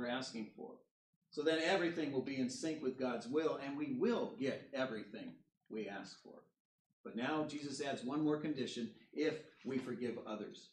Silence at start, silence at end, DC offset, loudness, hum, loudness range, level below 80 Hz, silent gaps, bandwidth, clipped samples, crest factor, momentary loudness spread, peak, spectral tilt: 0 s; 0.05 s; under 0.1%; -41 LUFS; none; 7 LU; -88 dBFS; 0.91-1.22 s, 5.57-5.61 s, 6.60-7.04 s; 10.5 kHz; under 0.1%; 20 dB; 13 LU; -22 dBFS; -5 dB/octave